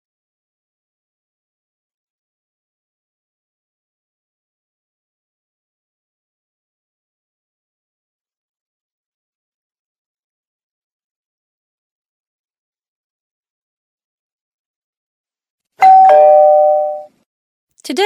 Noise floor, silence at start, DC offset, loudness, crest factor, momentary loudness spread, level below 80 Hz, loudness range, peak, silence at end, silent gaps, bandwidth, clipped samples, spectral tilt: under -90 dBFS; 15.8 s; under 0.1%; -8 LUFS; 18 dB; 17 LU; -80 dBFS; 4 LU; 0 dBFS; 0 s; 17.26-17.67 s; 12 kHz; under 0.1%; -2.5 dB/octave